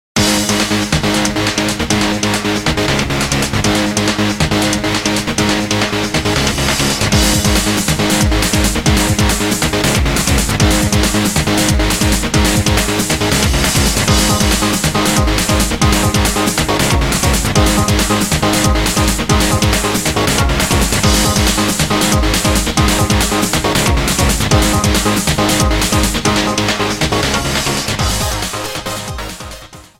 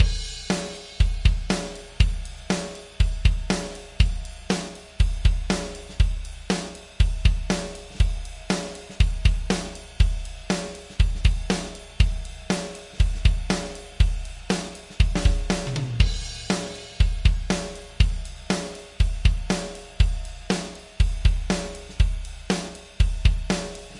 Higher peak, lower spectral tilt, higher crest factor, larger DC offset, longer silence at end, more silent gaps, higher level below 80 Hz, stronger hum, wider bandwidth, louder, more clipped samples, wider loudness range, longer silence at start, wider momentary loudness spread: first, 0 dBFS vs -4 dBFS; second, -3.5 dB/octave vs -5 dB/octave; second, 14 dB vs 20 dB; neither; first, 0.2 s vs 0 s; neither; about the same, -22 dBFS vs -26 dBFS; neither; first, 16.5 kHz vs 11.5 kHz; first, -13 LUFS vs -26 LUFS; neither; about the same, 2 LU vs 1 LU; first, 0.15 s vs 0 s; second, 3 LU vs 13 LU